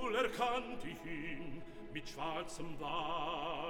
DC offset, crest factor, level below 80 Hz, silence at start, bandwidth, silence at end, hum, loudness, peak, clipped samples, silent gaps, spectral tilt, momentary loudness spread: under 0.1%; 16 dB; -58 dBFS; 0 s; 17 kHz; 0 s; none; -41 LUFS; -24 dBFS; under 0.1%; none; -4 dB/octave; 11 LU